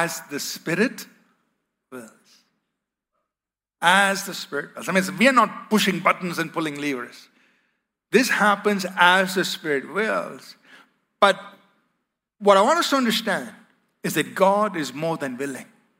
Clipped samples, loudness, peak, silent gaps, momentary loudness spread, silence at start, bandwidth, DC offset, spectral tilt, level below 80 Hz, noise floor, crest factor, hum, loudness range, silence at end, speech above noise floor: under 0.1%; -21 LUFS; -2 dBFS; none; 15 LU; 0 s; 16 kHz; under 0.1%; -3.5 dB/octave; -76 dBFS; -90 dBFS; 22 dB; none; 5 LU; 0.35 s; 68 dB